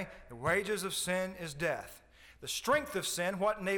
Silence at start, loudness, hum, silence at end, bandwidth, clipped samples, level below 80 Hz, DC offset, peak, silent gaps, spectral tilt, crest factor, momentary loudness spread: 0 s; -34 LUFS; none; 0 s; over 20 kHz; under 0.1%; -60 dBFS; under 0.1%; -18 dBFS; none; -3 dB/octave; 18 dB; 10 LU